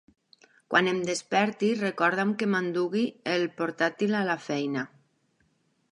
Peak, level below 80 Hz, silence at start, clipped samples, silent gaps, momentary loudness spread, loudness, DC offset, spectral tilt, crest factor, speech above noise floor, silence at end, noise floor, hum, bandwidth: -6 dBFS; -78 dBFS; 0.7 s; under 0.1%; none; 5 LU; -27 LUFS; under 0.1%; -5 dB/octave; 22 dB; 43 dB; 1.05 s; -70 dBFS; none; 11.5 kHz